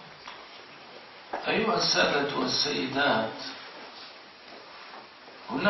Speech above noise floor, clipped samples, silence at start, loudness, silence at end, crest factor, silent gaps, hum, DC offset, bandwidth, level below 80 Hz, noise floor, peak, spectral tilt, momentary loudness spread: 21 dB; under 0.1%; 0 s; -27 LUFS; 0 s; 20 dB; none; none; under 0.1%; 6.6 kHz; -66 dBFS; -48 dBFS; -10 dBFS; -3.5 dB/octave; 22 LU